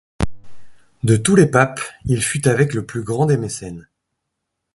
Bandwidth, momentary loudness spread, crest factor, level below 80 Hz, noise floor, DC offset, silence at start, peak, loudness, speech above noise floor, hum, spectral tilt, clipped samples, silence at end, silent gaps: 11.5 kHz; 14 LU; 18 dB; -40 dBFS; -77 dBFS; under 0.1%; 0.2 s; 0 dBFS; -18 LUFS; 60 dB; none; -5.5 dB/octave; under 0.1%; 0.95 s; none